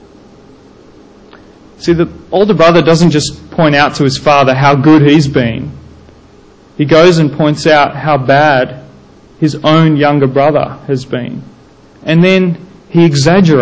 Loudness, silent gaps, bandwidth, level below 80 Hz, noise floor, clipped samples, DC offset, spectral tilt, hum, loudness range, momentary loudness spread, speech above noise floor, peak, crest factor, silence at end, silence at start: -9 LUFS; none; 8 kHz; -40 dBFS; -40 dBFS; 0.3%; under 0.1%; -6.5 dB/octave; none; 4 LU; 12 LU; 32 dB; 0 dBFS; 10 dB; 0 s; 1.8 s